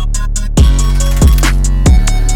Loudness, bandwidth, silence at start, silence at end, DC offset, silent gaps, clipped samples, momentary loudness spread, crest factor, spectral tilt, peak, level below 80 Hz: -12 LUFS; 17 kHz; 0 s; 0 s; 0.7%; none; under 0.1%; 6 LU; 8 dB; -5 dB/octave; 0 dBFS; -10 dBFS